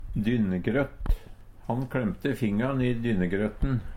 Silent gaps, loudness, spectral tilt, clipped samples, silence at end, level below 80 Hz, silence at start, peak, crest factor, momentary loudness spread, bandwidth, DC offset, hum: none; -28 LUFS; -8.5 dB/octave; under 0.1%; 0 s; -36 dBFS; 0 s; -12 dBFS; 16 dB; 7 LU; 16 kHz; under 0.1%; none